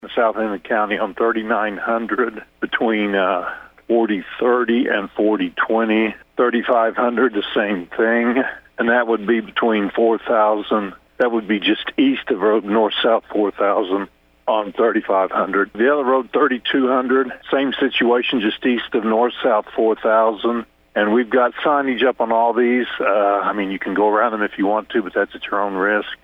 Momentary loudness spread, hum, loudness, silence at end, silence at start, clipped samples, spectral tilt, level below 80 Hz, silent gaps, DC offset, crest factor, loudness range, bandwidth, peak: 6 LU; none; -18 LUFS; 0.1 s; 0.05 s; under 0.1%; -7.5 dB/octave; -58 dBFS; none; under 0.1%; 14 dB; 2 LU; 5.2 kHz; -4 dBFS